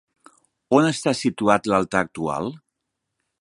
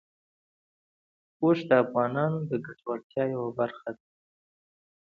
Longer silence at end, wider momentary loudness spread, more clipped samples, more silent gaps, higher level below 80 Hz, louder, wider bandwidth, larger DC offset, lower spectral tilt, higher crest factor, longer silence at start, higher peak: second, 0.85 s vs 1.1 s; second, 8 LU vs 14 LU; neither; second, none vs 3.03-3.10 s; first, -58 dBFS vs -72 dBFS; first, -21 LUFS vs -28 LUFS; first, 11.5 kHz vs 6.6 kHz; neither; second, -5 dB/octave vs -9 dB/octave; about the same, 22 dB vs 24 dB; second, 0.7 s vs 1.4 s; first, -2 dBFS vs -6 dBFS